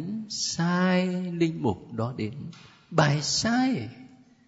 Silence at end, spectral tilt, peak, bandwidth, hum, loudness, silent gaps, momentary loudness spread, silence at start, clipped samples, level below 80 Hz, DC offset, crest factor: 0.3 s; -4.5 dB/octave; -6 dBFS; 8 kHz; none; -26 LUFS; none; 11 LU; 0 s; under 0.1%; -60 dBFS; under 0.1%; 22 dB